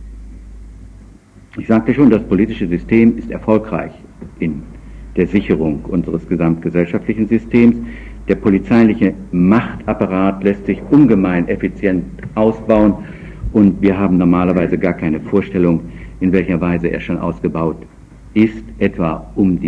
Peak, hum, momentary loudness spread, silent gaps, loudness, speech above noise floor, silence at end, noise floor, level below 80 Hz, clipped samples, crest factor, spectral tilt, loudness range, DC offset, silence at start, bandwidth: 0 dBFS; none; 12 LU; none; -15 LUFS; 27 dB; 0 s; -41 dBFS; -34 dBFS; under 0.1%; 14 dB; -9.5 dB/octave; 4 LU; under 0.1%; 0 s; 6.8 kHz